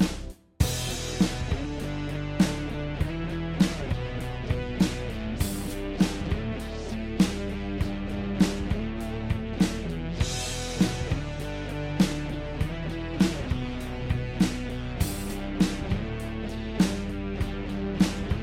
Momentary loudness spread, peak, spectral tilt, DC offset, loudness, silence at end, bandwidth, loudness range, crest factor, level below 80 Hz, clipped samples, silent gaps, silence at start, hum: 7 LU; -8 dBFS; -5.5 dB/octave; under 0.1%; -29 LUFS; 0 s; 16 kHz; 1 LU; 20 dB; -36 dBFS; under 0.1%; none; 0 s; none